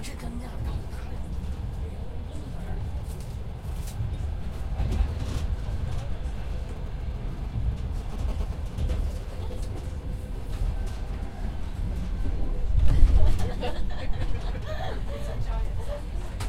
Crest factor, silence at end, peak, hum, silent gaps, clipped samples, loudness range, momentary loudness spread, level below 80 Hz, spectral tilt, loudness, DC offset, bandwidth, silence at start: 22 dB; 0 s; -4 dBFS; none; none; under 0.1%; 6 LU; 8 LU; -28 dBFS; -6.5 dB/octave; -32 LUFS; under 0.1%; 12 kHz; 0 s